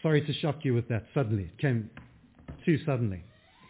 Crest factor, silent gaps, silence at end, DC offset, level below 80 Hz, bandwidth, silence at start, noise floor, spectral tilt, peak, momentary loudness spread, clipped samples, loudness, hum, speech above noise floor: 18 dB; none; 0.45 s; under 0.1%; -54 dBFS; 4 kHz; 0.05 s; -49 dBFS; -11 dB/octave; -12 dBFS; 9 LU; under 0.1%; -30 LUFS; none; 20 dB